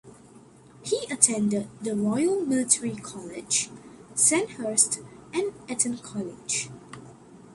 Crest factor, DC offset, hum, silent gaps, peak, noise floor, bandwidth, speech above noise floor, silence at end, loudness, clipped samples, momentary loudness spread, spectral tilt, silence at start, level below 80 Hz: 26 dB; under 0.1%; none; none; -2 dBFS; -51 dBFS; 12 kHz; 25 dB; 0 s; -25 LUFS; under 0.1%; 17 LU; -3 dB/octave; 0.05 s; -66 dBFS